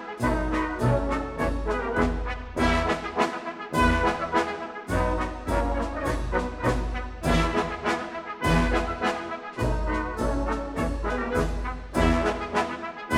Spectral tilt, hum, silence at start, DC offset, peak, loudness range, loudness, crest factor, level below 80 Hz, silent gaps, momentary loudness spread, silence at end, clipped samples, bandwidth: -6 dB/octave; none; 0 s; under 0.1%; -8 dBFS; 2 LU; -27 LUFS; 18 dB; -32 dBFS; none; 7 LU; 0 s; under 0.1%; 13.5 kHz